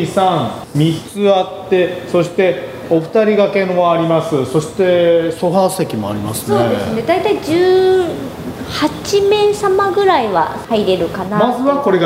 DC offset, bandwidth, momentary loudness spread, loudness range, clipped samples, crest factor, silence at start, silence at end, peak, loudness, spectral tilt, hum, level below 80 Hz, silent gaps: under 0.1%; 16 kHz; 7 LU; 1 LU; under 0.1%; 14 dB; 0 s; 0 s; 0 dBFS; -14 LUFS; -6 dB/octave; none; -46 dBFS; none